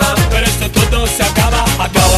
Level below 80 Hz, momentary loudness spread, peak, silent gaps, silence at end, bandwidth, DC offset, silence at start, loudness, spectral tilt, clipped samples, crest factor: -18 dBFS; 1 LU; 0 dBFS; none; 0 s; 14.5 kHz; under 0.1%; 0 s; -12 LUFS; -4 dB/octave; under 0.1%; 12 dB